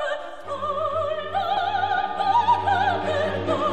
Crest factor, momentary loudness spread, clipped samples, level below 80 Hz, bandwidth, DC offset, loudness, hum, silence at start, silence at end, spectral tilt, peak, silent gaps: 14 dB; 9 LU; under 0.1%; -56 dBFS; 9.2 kHz; 0.9%; -23 LUFS; none; 0 s; 0 s; -5.5 dB/octave; -10 dBFS; none